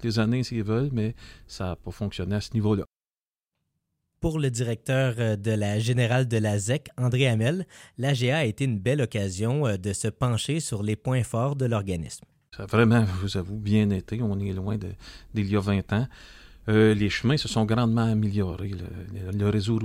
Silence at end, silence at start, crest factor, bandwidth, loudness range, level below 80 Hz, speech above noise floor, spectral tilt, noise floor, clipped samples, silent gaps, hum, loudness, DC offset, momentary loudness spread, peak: 0 s; 0 s; 18 dB; 14.5 kHz; 4 LU; -48 dBFS; over 65 dB; -6 dB/octave; under -90 dBFS; under 0.1%; none; none; -26 LUFS; under 0.1%; 11 LU; -6 dBFS